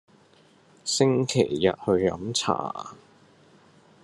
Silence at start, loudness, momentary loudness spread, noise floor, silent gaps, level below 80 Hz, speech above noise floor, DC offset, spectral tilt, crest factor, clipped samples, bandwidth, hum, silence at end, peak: 0.85 s; -25 LUFS; 13 LU; -58 dBFS; none; -66 dBFS; 33 dB; under 0.1%; -4.5 dB/octave; 22 dB; under 0.1%; 12.5 kHz; none; 1.1 s; -6 dBFS